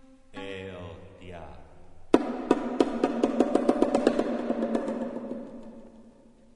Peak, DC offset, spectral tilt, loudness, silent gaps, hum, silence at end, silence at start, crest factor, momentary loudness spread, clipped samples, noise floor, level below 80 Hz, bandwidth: -4 dBFS; under 0.1%; -6 dB/octave; -27 LUFS; none; none; 0.45 s; 0.3 s; 26 dB; 21 LU; under 0.1%; -54 dBFS; -54 dBFS; 11 kHz